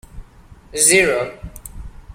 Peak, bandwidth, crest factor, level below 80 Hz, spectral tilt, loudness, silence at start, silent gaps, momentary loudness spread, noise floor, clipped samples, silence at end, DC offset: 0 dBFS; 16.5 kHz; 20 dB; -38 dBFS; -2 dB/octave; -14 LUFS; 0.15 s; none; 24 LU; -44 dBFS; under 0.1%; 0 s; under 0.1%